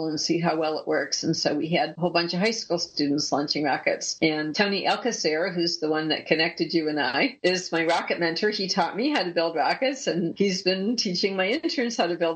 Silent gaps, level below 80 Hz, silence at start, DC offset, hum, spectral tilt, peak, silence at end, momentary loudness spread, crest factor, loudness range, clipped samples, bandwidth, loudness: none; -72 dBFS; 0 s; under 0.1%; none; -4 dB/octave; -6 dBFS; 0 s; 2 LU; 20 dB; 1 LU; under 0.1%; 8.8 kHz; -25 LUFS